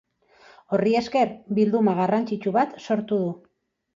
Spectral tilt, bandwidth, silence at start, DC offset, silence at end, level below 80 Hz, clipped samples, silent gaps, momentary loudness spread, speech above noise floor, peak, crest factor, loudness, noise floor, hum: -7.5 dB/octave; 7.4 kHz; 0.7 s; under 0.1%; 0.6 s; -66 dBFS; under 0.1%; none; 6 LU; 32 dB; -8 dBFS; 16 dB; -23 LUFS; -55 dBFS; none